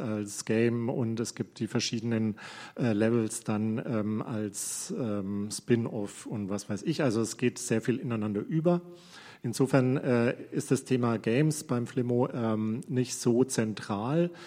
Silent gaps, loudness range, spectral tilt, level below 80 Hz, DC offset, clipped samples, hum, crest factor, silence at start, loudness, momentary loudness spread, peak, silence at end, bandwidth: none; 3 LU; -5.5 dB/octave; -72 dBFS; under 0.1%; under 0.1%; none; 20 dB; 0 s; -30 LUFS; 8 LU; -10 dBFS; 0 s; 15.5 kHz